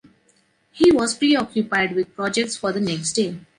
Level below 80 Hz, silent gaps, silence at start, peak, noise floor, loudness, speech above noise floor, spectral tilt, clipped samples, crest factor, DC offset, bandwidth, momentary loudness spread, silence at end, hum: -56 dBFS; none; 0.75 s; -4 dBFS; -62 dBFS; -20 LUFS; 42 dB; -4 dB/octave; under 0.1%; 16 dB; under 0.1%; 11.5 kHz; 7 LU; 0.2 s; none